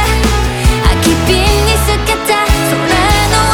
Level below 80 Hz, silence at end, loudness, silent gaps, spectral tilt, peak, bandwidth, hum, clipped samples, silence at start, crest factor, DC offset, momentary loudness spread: -16 dBFS; 0 s; -11 LUFS; none; -4 dB/octave; 0 dBFS; 19 kHz; none; under 0.1%; 0 s; 10 dB; under 0.1%; 3 LU